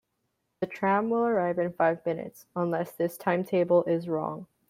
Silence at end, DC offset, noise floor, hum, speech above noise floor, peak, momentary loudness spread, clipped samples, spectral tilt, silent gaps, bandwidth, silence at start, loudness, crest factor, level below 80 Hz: 0.25 s; under 0.1%; -78 dBFS; none; 51 dB; -10 dBFS; 12 LU; under 0.1%; -7.5 dB/octave; none; 16 kHz; 0.6 s; -28 LUFS; 18 dB; -72 dBFS